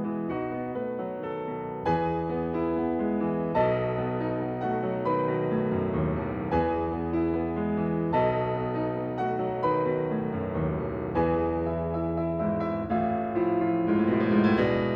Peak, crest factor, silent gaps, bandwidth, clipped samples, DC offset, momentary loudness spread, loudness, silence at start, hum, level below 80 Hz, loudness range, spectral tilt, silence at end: -10 dBFS; 16 dB; none; 5.6 kHz; under 0.1%; under 0.1%; 7 LU; -28 LUFS; 0 s; none; -48 dBFS; 1 LU; -10 dB/octave; 0 s